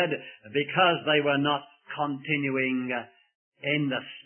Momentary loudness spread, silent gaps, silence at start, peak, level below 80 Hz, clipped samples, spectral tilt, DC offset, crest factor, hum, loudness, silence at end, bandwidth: 11 LU; 3.35-3.52 s; 0 s; -8 dBFS; -76 dBFS; under 0.1%; -9.5 dB/octave; under 0.1%; 20 dB; none; -27 LUFS; 0.05 s; 3.4 kHz